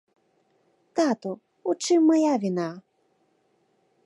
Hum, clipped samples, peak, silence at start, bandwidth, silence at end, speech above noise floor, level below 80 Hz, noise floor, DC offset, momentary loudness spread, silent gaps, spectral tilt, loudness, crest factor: none; under 0.1%; -10 dBFS; 0.95 s; 11.5 kHz; 1.25 s; 46 dB; -82 dBFS; -68 dBFS; under 0.1%; 14 LU; none; -5 dB/octave; -24 LUFS; 16 dB